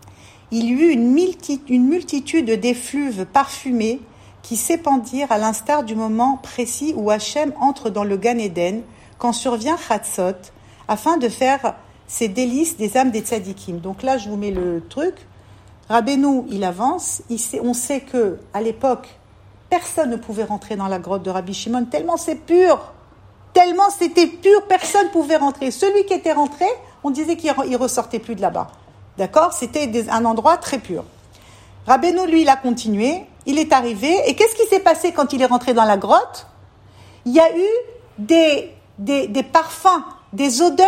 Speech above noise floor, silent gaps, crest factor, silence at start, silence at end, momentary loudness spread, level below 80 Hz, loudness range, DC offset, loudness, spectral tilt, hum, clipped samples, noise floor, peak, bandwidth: 29 dB; none; 18 dB; 0.05 s; 0 s; 10 LU; -52 dBFS; 6 LU; under 0.1%; -18 LUFS; -4 dB/octave; none; under 0.1%; -47 dBFS; 0 dBFS; 16 kHz